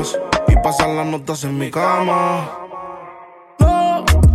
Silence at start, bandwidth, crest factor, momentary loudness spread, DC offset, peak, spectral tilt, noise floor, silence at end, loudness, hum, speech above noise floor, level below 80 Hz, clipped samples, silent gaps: 0 s; 14.5 kHz; 14 dB; 17 LU; under 0.1%; -2 dBFS; -6 dB/octave; -40 dBFS; 0 s; -17 LUFS; none; 22 dB; -22 dBFS; under 0.1%; none